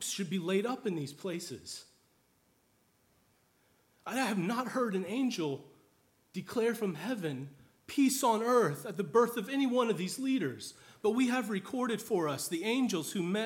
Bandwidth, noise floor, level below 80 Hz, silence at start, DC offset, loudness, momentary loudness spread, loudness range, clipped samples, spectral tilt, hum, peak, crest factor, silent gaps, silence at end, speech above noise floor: 18.5 kHz; -71 dBFS; -80 dBFS; 0 s; under 0.1%; -33 LUFS; 14 LU; 9 LU; under 0.1%; -4.5 dB/octave; none; -14 dBFS; 20 dB; none; 0 s; 39 dB